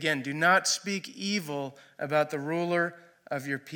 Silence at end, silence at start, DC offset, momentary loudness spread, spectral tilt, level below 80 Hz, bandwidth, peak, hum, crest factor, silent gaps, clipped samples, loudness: 0 s; 0 s; under 0.1%; 13 LU; -3.5 dB/octave; -82 dBFS; 17.5 kHz; -12 dBFS; none; 18 dB; none; under 0.1%; -28 LUFS